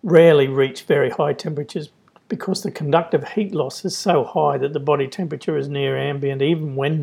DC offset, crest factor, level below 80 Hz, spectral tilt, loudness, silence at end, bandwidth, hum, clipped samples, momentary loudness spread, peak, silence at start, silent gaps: under 0.1%; 20 dB; -72 dBFS; -6 dB/octave; -20 LUFS; 0 s; 15 kHz; none; under 0.1%; 10 LU; 0 dBFS; 0.05 s; none